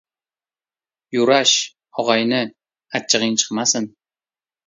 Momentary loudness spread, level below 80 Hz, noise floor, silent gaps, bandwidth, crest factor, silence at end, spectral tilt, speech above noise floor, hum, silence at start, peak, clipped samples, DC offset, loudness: 13 LU; -70 dBFS; under -90 dBFS; none; 7.8 kHz; 20 dB; 0.8 s; -2 dB/octave; over 72 dB; none; 1.1 s; 0 dBFS; under 0.1%; under 0.1%; -18 LUFS